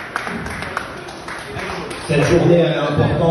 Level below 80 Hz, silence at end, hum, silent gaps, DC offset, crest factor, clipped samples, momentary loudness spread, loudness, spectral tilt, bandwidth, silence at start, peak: -38 dBFS; 0 s; none; none; under 0.1%; 16 dB; under 0.1%; 16 LU; -18 LUFS; -6.5 dB/octave; 12 kHz; 0 s; -2 dBFS